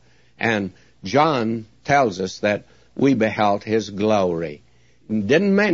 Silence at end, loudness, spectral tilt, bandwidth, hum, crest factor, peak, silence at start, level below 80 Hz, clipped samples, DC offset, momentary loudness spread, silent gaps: 0 s; -20 LUFS; -6 dB/octave; 7.6 kHz; none; 16 dB; -4 dBFS; 0.4 s; -58 dBFS; under 0.1%; 0.2%; 10 LU; none